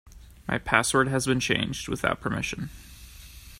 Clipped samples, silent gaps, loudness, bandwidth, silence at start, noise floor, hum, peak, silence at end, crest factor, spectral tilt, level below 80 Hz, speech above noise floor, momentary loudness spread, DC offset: under 0.1%; none; -26 LUFS; 16 kHz; 0.05 s; -46 dBFS; none; -2 dBFS; 0 s; 26 dB; -4 dB/octave; -48 dBFS; 20 dB; 23 LU; under 0.1%